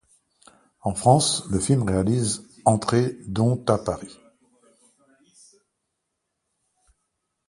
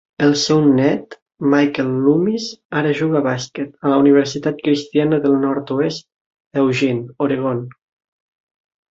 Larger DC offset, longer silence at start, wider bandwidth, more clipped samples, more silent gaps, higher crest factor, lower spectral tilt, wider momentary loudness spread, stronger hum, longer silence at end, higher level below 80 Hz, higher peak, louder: neither; first, 0.85 s vs 0.2 s; first, 11.5 kHz vs 7.8 kHz; neither; second, none vs 1.22-1.26 s, 2.65-2.69 s, 6.21-6.31 s, 6.40-6.51 s; first, 22 dB vs 16 dB; about the same, -5.5 dB/octave vs -6 dB/octave; about the same, 11 LU vs 10 LU; neither; first, 3.35 s vs 1.2 s; first, -48 dBFS vs -60 dBFS; about the same, -2 dBFS vs -2 dBFS; second, -23 LUFS vs -17 LUFS